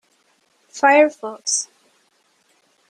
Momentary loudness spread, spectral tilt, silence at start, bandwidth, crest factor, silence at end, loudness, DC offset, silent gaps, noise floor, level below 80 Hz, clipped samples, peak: 19 LU; -0.5 dB/octave; 0.75 s; 10.5 kHz; 20 dB; 1.25 s; -17 LUFS; under 0.1%; none; -62 dBFS; -76 dBFS; under 0.1%; -2 dBFS